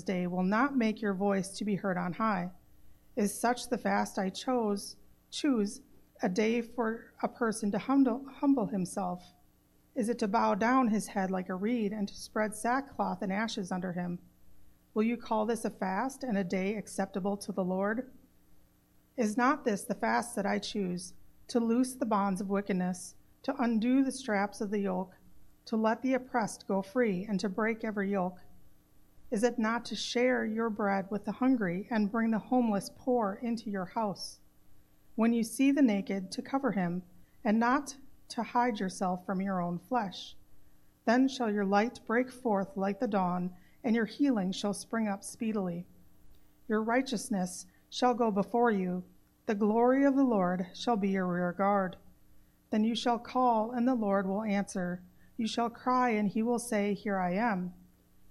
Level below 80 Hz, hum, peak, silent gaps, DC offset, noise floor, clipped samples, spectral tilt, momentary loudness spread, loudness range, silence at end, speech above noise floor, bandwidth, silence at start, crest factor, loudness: -66 dBFS; 60 Hz at -60 dBFS; -14 dBFS; none; under 0.1%; -66 dBFS; under 0.1%; -5.5 dB/octave; 10 LU; 4 LU; 0.6 s; 35 dB; 13.5 kHz; 0 s; 18 dB; -32 LUFS